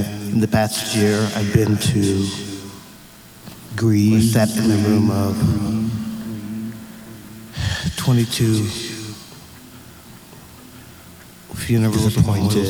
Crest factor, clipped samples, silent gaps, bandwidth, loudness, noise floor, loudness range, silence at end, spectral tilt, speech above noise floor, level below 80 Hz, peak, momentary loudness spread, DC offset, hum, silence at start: 18 dB; under 0.1%; none; over 20 kHz; -19 LUFS; -43 dBFS; 6 LU; 0 s; -6 dB/octave; 26 dB; -42 dBFS; -2 dBFS; 24 LU; under 0.1%; none; 0 s